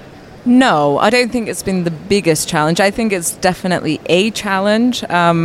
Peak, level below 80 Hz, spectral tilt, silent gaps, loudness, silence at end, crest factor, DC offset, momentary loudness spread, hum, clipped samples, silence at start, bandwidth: 0 dBFS; -44 dBFS; -4.5 dB/octave; none; -14 LUFS; 0 s; 14 dB; under 0.1%; 6 LU; none; under 0.1%; 0 s; 16 kHz